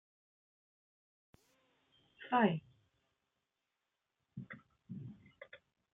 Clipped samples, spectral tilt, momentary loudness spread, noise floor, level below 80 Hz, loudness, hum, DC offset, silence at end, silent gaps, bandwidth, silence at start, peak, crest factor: under 0.1%; -8.5 dB/octave; 25 LU; -88 dBFS; -84 dBFS; -35 LUFS; none; under 0.1%; 0.4 s; none; 3.9 kHz; 2.2 s; -18 dBFS; 24 dB